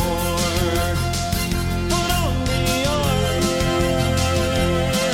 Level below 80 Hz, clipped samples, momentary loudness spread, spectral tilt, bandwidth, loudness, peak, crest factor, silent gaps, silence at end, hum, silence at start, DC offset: -28 dBFS; under 0.1%; 3 LU; -4.5 dB/octave; 17 kHz; -20 LUFS; -6 dBFS; 14 dB; none; 0 s; none; 0 s; under 0.1%